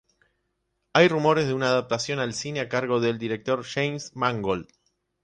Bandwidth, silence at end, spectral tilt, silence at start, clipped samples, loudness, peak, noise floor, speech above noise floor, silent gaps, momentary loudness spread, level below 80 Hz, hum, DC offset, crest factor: 9.8 kHz; 0.6 s; -5 dB/octave; 0.95 s; under 0.1%; -25 LUFS; -4 dBFS; -76 dBFS; 52 dB; none; 9 LU; -60 dBFS; none; under 0.1%; 20 dB